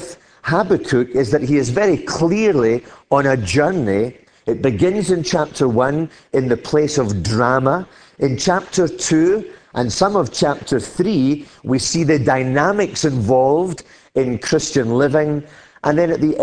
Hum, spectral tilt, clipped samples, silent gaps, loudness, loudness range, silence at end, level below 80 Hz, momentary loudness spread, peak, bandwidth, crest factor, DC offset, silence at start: none; -5.5 dB/octave; under 0.1%; none; -17 LUFS; 1 LU; 0 s; -46 dBFS; 8 LU; 0 dBFS; 10.5 kHz; 16 dB; under 0.1%; 0 s